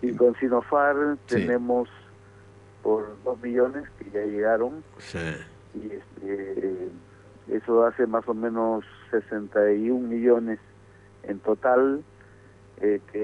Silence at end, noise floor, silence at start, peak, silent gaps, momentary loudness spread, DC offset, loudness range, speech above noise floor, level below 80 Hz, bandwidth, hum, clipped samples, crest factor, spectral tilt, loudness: 0 s; -52 dBFS; 0 s; -8 dBFS; none; 16 LU; under 0.1%; 5 LU; 27 dB; -60 dBFS; 10.5 kHz; none; under 0.1%; 18 dB; -7.5 dB/octave; -25 LUFS